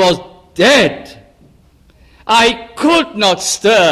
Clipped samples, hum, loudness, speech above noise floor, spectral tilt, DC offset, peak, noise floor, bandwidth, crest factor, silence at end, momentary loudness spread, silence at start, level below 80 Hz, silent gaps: under 0.1%; none; -12 LUFS; 36 dB; -3 dB/octave; under 0.1%; 0 dBFS; -48 dBFS; 15 kHz; 14 dB; 0 s; 15 LU; 0 s; -46 dBFS; none